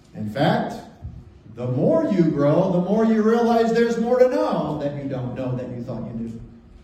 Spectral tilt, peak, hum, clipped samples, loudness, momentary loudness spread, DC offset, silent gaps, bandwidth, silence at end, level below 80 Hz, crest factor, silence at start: -8 dB/octave; -4 dBFS; none; under 0.1%; -21 LUFS; 14 LU; under 0.1%; none; 13 kHz; 0.25 s; -50 dBFS; 18 dB; 0.15 s